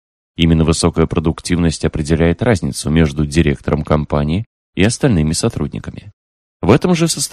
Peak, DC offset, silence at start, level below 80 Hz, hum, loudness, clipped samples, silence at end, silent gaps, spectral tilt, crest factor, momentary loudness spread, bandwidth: 0 dBFS; under 0.1%; 0.4 s; -28 dBFS; none; -15 LUFS; under 0.1%; 0.05 s; 4.46-4.73 s, 6.13-6.60 s; -5.5 dB/octave; 16 dB; 9 LU; 13.5 kHz